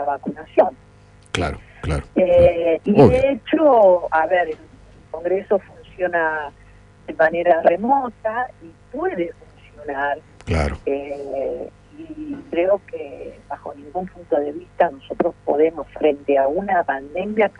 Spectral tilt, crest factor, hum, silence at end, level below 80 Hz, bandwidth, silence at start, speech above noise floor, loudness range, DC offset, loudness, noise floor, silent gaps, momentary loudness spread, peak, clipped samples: -7 dB/octave; 20 dB; 50 Hz at -50 dBFS; 0.1 s; -40 dBFS; 10.5 kHz; 0 s; 29 dB; 10 LU; under 0.1%; -20 LUFS; -48 dBFS; none; 18 LU; 0 dBFS; under 0.1%